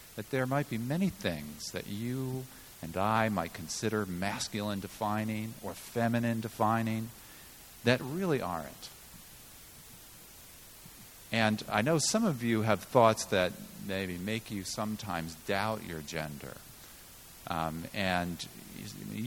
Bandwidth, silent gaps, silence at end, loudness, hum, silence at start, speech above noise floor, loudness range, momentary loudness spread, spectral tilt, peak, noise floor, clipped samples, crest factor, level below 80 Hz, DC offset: 19 kHz; none; 0 s; -33 LUFS; none; 0 s; 20 dB; 8 LU; 21 LU; -5 dB/octave; -8 dBFS; -52 dBFS; under 0.1%; 26 dB; -60 dBFS; under 0.1%